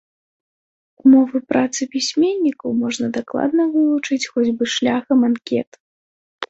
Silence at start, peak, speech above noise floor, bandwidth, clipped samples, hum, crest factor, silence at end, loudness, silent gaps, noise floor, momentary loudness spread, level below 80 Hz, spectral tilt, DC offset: 1.05 s; -2 dBFS; over 73 dB; 8.2 kHz; under 0.1%; none; 16 dB; 0.05 s; -18 LUFS; 5.67-5.72 s, 5.80-6.39 s; under -90 dBFS; 8 LU; -64 dBFS; -4 dB/octave; under 0.1%